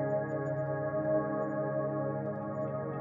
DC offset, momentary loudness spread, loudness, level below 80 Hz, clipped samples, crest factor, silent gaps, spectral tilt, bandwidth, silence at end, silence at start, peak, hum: under 0.1%; 5 LU; -34 LUFS; -68 dBFS; under 0.1%; 14 dB; none; -11.5 dB/octave; 7.2 kHz; 0 s; 0 s; -20 dBFS; none